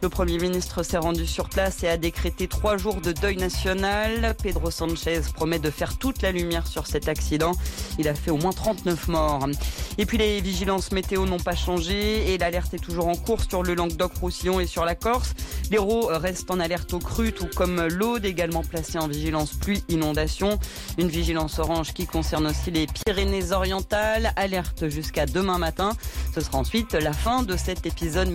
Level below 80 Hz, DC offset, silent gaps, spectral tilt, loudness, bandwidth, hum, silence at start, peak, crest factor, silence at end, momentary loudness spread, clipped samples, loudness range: -32 dBFS; under 0.1%; none; -5 dB/octave; -25 LUFS; 17 kHz; none; 0 s; -12 dBFS; 14 dB; 0 s; 4 LU; under 0.1%; 1 LU